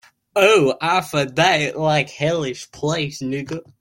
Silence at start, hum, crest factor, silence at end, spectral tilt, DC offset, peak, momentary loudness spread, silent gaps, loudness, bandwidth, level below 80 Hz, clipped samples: 0.35 s; none; 18 dB; 0.2 s; -4.5 dB/octave; under 0.1%; -2 dBFS; 12 LU; none; -19 LUFS; 16.5 kHz; -56 dBFS; under 0.1%